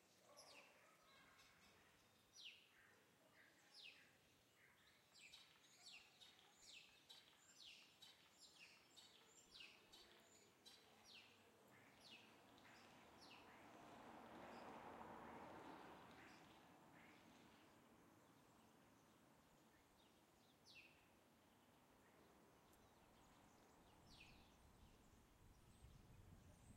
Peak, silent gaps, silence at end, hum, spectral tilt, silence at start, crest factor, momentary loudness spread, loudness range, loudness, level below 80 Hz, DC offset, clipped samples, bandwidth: -46 dBFS; none; 0 s; none; -3 dB/octave; 0 s; 22 dB; 9 LU; 6 LU; -65 LUFS; -84 dBFS; under 0.1%; under 0.1%; 16 kHz